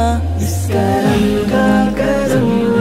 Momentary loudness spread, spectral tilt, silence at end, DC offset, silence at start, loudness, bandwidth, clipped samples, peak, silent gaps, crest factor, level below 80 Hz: 4 LU; -6.5 dB/octave; 0 s; under 0.1%; 0 s; -14 LUFS; 16 kHz; under 0.1%; 0 dBFS; none; 12 dB; -28 dBFS